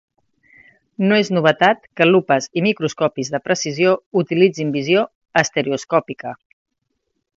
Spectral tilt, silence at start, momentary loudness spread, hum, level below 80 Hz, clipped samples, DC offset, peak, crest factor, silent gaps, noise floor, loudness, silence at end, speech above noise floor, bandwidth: -5 dB/octave; 1 s; 7 LU; none; -64 dBFS; under 0.1%; under 0.1%; 0 dBFS; 18 dB; 4.06-4.11 s, 5.15-5.21 s; -73 dBFS; -18 LUFS; 1 s; 56 dB; 7.8 kHz